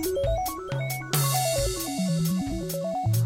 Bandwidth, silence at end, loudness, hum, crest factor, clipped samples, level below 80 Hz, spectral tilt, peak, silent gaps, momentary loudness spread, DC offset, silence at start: 16.5 kHz; 0 s; -27 LUFS; none; 16 dB; under 0.1%; -40 dBFS; -5 dB/octave; -10 dBFS; none; 6 LU; under 0.1%; 0 s